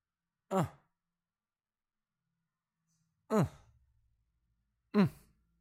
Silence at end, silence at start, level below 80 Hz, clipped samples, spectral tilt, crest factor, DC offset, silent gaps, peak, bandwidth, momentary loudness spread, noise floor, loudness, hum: 0.5 s; 0.5 s; -68 dBFS; under 0.1%; -7.5 dB/octave; 26 dB; under 0.1%; none; -14 dBFS; 15.5 kHz; 6 LU; under -90 dBFS; -34 LUFS; none